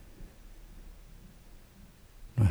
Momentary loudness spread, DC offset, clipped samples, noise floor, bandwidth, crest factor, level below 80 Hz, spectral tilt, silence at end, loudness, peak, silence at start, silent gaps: 18 LU; under 0.1%; under 0.1%; -55 dBFS; over 20 kHz; 22 dB; -50 dBFS; -8 dB/octave; 0 s; -32 LUFS; -14 dBFS; 0.2 s; none